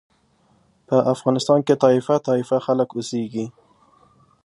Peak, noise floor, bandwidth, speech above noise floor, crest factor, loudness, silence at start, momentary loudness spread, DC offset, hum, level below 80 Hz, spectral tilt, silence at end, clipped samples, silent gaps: -2 dBFS; -60 dBFS; 11.5 kHz; 41 dB; 20 dB; -20 LUFS; 0.9 s; 10 LU; under 0.1%; none; -68 dBFS; -6.5 dB/octave; 0.95 s; under 0.1%; none